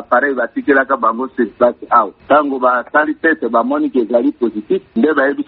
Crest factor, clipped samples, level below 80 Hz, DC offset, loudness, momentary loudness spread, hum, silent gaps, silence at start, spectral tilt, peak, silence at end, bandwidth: 14 dB; under 0.1%; -58 dBFS; under 0.1%; -15 LUFS; 6 LU; none; none; 0 s; -3.5 dB/octave; 0 dBFS; 0.05 s; 4.4 kHz